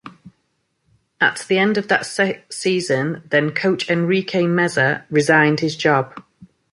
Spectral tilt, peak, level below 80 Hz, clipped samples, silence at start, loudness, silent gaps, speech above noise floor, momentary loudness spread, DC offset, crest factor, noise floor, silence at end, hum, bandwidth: -5 dB/octave; -2 dBFS; -62 dBFS; under 0.1%; 0.05 s; -18 LUFS; none; 51 dB; 6 LU; under 0.1%; 18 dB; -69 dBFS; 0.3 s; none; 11.5 kHz